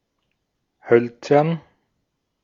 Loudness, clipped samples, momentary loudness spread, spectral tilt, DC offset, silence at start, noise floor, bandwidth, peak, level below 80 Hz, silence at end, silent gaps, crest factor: -19 LUFS; under 0.1%; 7 LU; -8 dB/octave; under 0.1%; 0.85 s; -74 dBFS; 7.4 kHz; -2 dBFS; -70 dBFS; 0.85 s; none; 22 dB